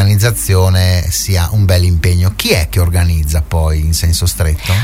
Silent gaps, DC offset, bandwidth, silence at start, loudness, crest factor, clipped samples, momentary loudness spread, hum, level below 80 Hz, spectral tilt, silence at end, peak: none; under 0.1%; 16.5 kHz; 0 s; -12 LUFS; 10 dB; under 0.1%; 3 LU; none; -20 dBFS; -4.5 dB/octave; 0 s; 0 dBFS